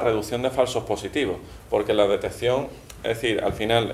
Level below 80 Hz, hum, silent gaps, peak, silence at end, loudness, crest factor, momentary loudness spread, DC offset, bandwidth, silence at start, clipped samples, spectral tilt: -46 dBFS; none; none; -4 dBFS; 0 s; -24 LUFS; 20 dB; 8 LU; under 0.1%; 15.5 kHz; 0 s; under 0.1%; -5 dB/octave